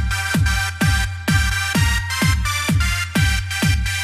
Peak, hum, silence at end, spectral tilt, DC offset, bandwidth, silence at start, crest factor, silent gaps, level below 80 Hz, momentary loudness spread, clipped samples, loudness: -4 dBFS; none; 0 s; -4 dB/octave; under 0.1%; 15.5 kHz; 0 s; 14 dB; none; -24 dBFS; 1 LU; under 0.1%; -19 LUFS